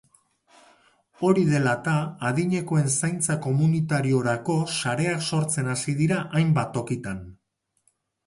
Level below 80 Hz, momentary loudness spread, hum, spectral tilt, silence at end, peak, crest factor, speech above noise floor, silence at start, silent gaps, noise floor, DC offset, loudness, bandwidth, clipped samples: -58 dBFS; 5 LU; none; -5.5 dB/octave; 0.95 s; -8 dBFS; 18 dB; 52 dB; 1.2 s; none; -75 dBFS; under 0.1%; -24 LUFS; 11.5 kHz; under 0.1%